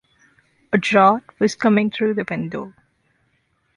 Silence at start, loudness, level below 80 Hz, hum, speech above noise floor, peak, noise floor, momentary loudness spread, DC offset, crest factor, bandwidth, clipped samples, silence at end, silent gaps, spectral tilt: 0.7 s; -19 LUFS; -62 dBFS; none; 48 dB; -2 dBFS; -66 dBFS; 14 LU; under 0.1%; 18 dB; 11 kHz; under 0.1%; 1.05 s; none; -6 dB/octave